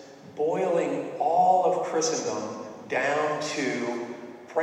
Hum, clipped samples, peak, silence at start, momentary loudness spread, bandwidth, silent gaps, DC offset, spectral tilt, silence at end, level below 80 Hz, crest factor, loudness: none; under 0.1%; -10 dBFS; 0 s; 15 LU; 11 kHz; none; under 0.1%; -3.5 dB/octave; 0 s; -78 dBFS; 16 dB; -26 LUFS